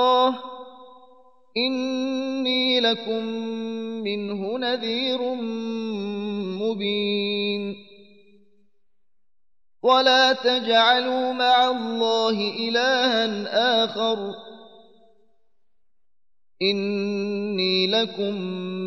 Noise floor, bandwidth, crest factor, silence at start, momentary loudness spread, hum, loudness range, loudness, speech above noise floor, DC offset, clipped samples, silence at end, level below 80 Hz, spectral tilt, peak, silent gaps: -82 dBFS; 7.6 kHz; 18 dB; 0 s; 11 LU; none; 9 LU; -22 LUFS; 59 dB; 0.2%; under 0.1%; 0 s; -78 dBFS; -4.5 dB/octave; -6 dBFS; none